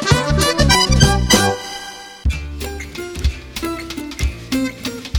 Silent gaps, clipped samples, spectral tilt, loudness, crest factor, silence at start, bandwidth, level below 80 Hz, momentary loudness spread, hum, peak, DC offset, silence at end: none; under 0.1%; -4 dB/octave; -17 LUFS; 18 dB; 0 s; 19 kHz; -24 dBFS; 15 LU; none; 0 dBFS; under 0.1%; 0 s